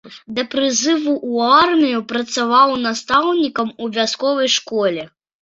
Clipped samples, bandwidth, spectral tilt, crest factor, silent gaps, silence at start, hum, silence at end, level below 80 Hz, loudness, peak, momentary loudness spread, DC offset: under 0.1%; 7.8 kHz; -2.5 dB/octave; 16 dB; none; 0.05 s; none; 0.35 s; -60 dBFS; -17 LUFS; 0 dBFS; 9 LU; under 0.1%